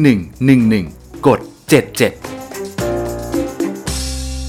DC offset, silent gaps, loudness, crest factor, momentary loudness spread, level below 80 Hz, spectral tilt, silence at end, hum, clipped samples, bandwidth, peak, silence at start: under 0.1%; none; -16 LUFS; 16 dB; 14 LU; -32 dBFS; -5.5 dB/octave; 0 s; none; under 0.1%; 18 kHz; 0 dBFS; 0 s